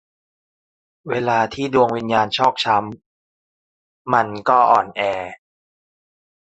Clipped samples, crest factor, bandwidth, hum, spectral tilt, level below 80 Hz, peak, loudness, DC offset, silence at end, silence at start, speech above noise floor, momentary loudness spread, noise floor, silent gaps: under 0.1%; 20 dB; 8.4 kHz; none; -5 dB/octave; -58 dBFS; -2 dBFS; -18 LUFS; under 0.1%; 1.15 s; 1.05 s; over 72 dB; 11 LU; under -90 dBFS; 3.06-4.05 s